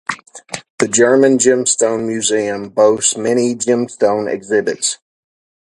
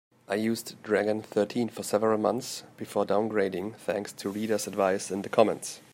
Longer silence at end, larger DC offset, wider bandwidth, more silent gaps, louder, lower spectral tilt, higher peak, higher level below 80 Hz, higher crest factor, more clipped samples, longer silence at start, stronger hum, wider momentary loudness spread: first, 0.7 s vs 0.15 s; neither; second, 11.5 kHz vs 16 kHz; first, 0.70-0.78 s vs none; first, -14 LUFS vs -29 LUFS; second, -3 dB/octave vs -4.5 dB/octave; first, 0 dBFS vs -8 dBFS; first, -60 dBFS vs -74 dBFS; second, 16 dB vs 22 dB; neither; second, 0.1 s vs 0.3 s; neither; first, 15 LU vs 9 LU